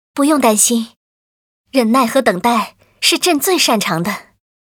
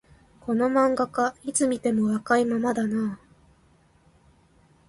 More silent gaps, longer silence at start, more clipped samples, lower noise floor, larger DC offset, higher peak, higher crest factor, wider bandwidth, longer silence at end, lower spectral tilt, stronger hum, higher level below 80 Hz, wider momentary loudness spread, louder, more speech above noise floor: first, 0.96-1.65 s vs none; second, 0.15 s vs 0.45 s; neither; first, under -90 dBFS vs -60 dBFS; neither; first, 0 dBFS vs -8 dBFS; about the same, 16 dB vs 18 dB; first, over 20 kHz vs 11.5 kHz; second, 0.5 s vs 1.7 s; second, -2.5 dB/octave vs -5 dB/octave; neither; about the same, -60 dBFS vs -60 dBFS; about the same, 9 LU vs 7 LU; first, -14 LUFS vs -24 LUFS; first, over 76 dB vs 36 dB